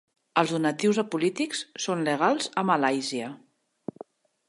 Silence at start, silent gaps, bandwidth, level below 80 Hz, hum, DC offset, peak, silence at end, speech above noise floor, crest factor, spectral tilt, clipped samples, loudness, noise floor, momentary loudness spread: 0.35 s; none; 11.5 kHz; -78 dBFS; none; under 0.1%; -6 dBFS; 1.15 s; 23 dB; 20 dB; -4.5 dB/octave; under 0.1%; -26 LUFS; -49 dBFS; 16 LU